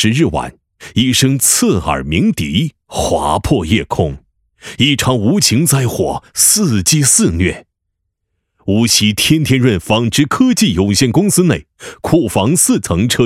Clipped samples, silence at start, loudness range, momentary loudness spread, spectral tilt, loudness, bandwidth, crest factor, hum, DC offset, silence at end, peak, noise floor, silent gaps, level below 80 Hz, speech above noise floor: under 0.1%; 0 s; 3 LU; 9 LU; -4 dB/octave; -12 LUFS; 16.5 kHz; 14 dB; none; under 0.1%; 0 s; 0 dBFS; -72 dBFS; none; -36 dBFS; 60 dB